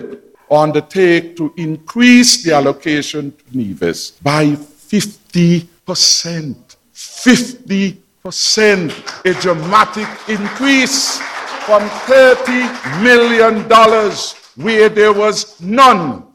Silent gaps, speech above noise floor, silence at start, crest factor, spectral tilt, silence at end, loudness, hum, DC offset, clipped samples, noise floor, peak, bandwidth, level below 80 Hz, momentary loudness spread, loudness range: none; 20 dB; 0 s; 12 dB; -3.5 dB/octave; 0.15 s; -12 LUFS; none; under 0.1%; 0.2%; -32 dBFS; 0 dBFS; 17.5 kHz; -54 dBFS; 15 LU; 4 LU